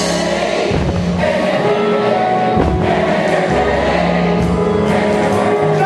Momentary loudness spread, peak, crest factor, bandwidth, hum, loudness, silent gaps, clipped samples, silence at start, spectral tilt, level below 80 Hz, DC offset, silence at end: 2 LU; -2 dBFS; 12 dB; 12 kHz; none; -14 LUFS; none; under 0.1%; 0 s; -6 dB/octave; -30 dBFS; under 0.1%; 0 s